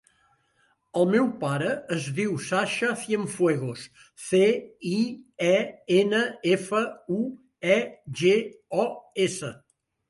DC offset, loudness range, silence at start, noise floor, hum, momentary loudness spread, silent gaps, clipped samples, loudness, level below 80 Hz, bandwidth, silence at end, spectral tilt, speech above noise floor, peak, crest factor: under 0.1%; 2 LU; 0.95 s; -68 dBFS; none; 10 LU; none; under 0.1%; -26 LUFS; -70 dBFS; 11.5 kHz; 0.55 s; -5 dB/octave; 43 dB; -8 dBFS; 18 dB